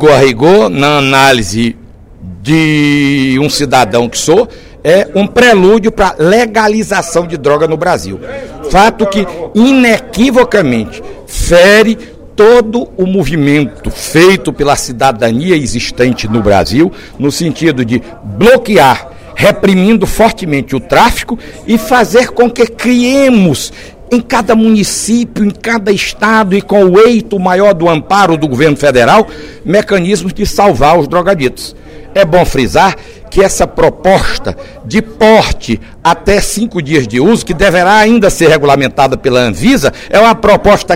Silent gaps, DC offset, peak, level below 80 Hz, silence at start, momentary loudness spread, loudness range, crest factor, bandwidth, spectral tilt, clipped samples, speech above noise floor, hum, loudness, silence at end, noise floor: none; under 0.1%; 0 dBFS; -28 dBFS; 0 s; 10 LU; 3 LU; 8 dB; 16.5 kHz; -5 dB/octave; 2%; 21 dB; none; -8 LUFS; 0 s; -30 dBFS